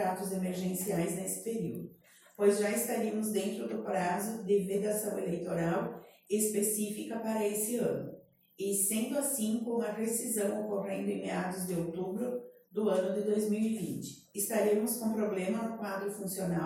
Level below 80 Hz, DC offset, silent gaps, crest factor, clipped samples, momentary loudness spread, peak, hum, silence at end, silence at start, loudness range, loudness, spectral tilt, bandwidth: -72 dBFS; under 0.1%; none; 20 dB; under 0.1%; 8 LU; -14 dBFS; none; 0 s; 0 s; 2 LU; -33 LUFS; -5 dB/octave; 16.5 kHz